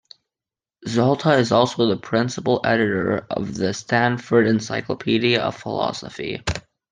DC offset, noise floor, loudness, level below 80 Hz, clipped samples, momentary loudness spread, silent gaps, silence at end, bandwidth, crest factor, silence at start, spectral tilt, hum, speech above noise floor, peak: under 0.1%; under -90 dBFS; -21 LUFS; -50 dBFS; under 0.1%; 10 LU; none; 0.3 s; 9.8 kHz; 18 dB; 0.8 s; -5.5 dB/octave; none; over 70 dB; -2 dBFS